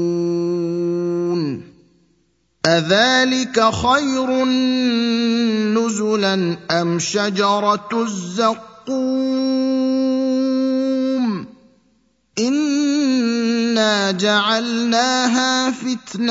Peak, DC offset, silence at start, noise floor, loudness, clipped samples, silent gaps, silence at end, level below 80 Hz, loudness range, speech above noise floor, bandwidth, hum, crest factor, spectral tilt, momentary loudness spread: 0 dBFS; under 0.1%; 0 s; -63 dBFS; -18 LUFS; under 0.1%; none; 0 s; -56 dBFS; 3 LU; 46 dB; 8 kHz; none; 18 dB; -4 dB/octave; 6 LU